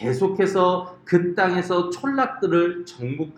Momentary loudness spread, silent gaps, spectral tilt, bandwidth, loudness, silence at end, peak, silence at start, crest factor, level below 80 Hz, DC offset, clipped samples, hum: 9 LU; none; -6.5 dB/octave; 10 kHz; -22 LUFS; 0.05 s; -4 dBFS; 0 s; 18 dB; -64 dBFS; under 0.1%; under 0.1%; none